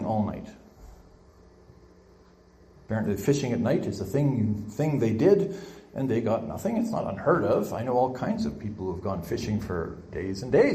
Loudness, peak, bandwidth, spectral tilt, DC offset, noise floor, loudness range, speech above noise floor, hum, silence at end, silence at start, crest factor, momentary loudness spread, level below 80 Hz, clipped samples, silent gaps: -27 LUFS; -8 dBFS; 15 kHz; -7.5 dB/octave; under 0.1%; -55 dBFS; 5 LU; 29 dB; none; 0 s; 0 s; 20 dB; 10 LU; -54 dBFS; under 0.1%; none